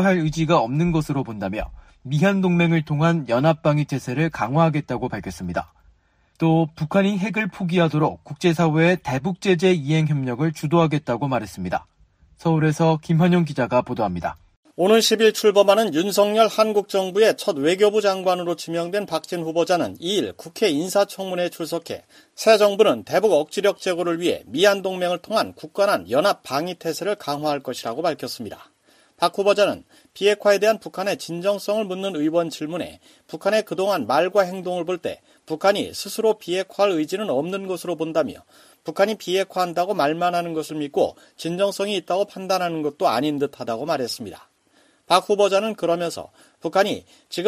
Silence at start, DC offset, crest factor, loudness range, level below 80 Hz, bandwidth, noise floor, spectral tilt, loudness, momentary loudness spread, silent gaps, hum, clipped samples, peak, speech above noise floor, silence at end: 0 s; under 0.1%; 20 dB; 5 LU; -54 dBFS; 15.5 kHz; -61 dBFS; -5.5 dB/octave; -21 LUFS; 11 LU; 14.56-14.63 s; none; under 0.1%; -2 dBFS; 40 dB; 0 s